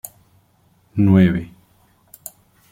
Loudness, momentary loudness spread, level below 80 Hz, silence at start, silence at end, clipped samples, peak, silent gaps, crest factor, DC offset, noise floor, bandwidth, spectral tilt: -17 LUFS; 24 LU; -50 dBFS; 0.95 s; 1.25 s; under 0.1%; -2 dBFS; none; 18 dB; under 0.1%; -58 dBFS; 16 kHz; -8 dB/octave